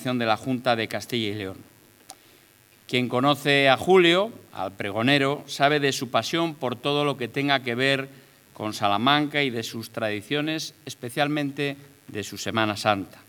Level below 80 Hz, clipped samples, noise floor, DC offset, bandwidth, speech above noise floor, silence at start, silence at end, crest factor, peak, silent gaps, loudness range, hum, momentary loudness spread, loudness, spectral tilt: -74 dBFS; under 0.1%; -56 dBFS; under 0.1%; 19.5 kHz; 32 dB; 0 s; 0.1 s; 22 dB; -2 dBFS; none; 6 LU; none; 14 LU; -24 LUFS; -4.5 dB/octave